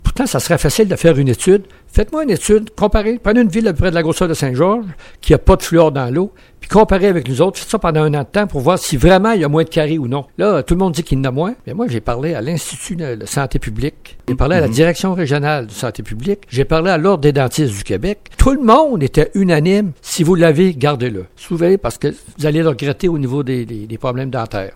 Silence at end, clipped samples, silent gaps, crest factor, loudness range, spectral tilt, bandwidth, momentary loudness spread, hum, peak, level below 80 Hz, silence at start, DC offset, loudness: 0.05 s; 0.2%; none; 14 dB; 4 LU; -6 dB/octave; 17 kHz; 10 LU; none; 0 dBFS; -26 dBFS; 0.05 s; under 0.1%; -15 LUFS